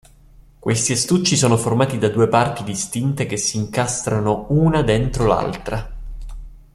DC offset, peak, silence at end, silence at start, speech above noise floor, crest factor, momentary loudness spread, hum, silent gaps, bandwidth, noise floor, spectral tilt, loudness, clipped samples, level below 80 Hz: under 0.1%; -2 dBFS; 0.15 s; 0.65 s; 29 dB; 18 dB; 12 LU; none; none; 14 kHz; -47 dBFS; -5 dB/octave; -19 LUFS; under 0.1%; -36 dBFS